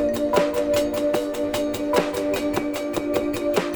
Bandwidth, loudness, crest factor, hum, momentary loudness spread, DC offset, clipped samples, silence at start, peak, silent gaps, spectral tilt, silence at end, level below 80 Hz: over 20 kHz; -23 LUFS; 18 dB; none; 4 LU; under 0.1%; under 0.1%; 0 s; -6 dBFS; none; -4.5 dB/octave; 0 s; -48 dBFS